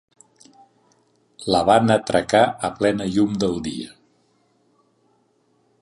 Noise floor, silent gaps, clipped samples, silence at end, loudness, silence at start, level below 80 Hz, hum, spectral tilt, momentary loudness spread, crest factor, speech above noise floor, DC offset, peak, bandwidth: -64 dBFS; none; under 0.1%; 1.95 s; -20 LUFS; 1.4 s; -52 dBFS; none; -5.5 dB/octave; 15 LU; 20 dB; 45 dB; under 0.1%; -2 dBFS; 11.5 kHz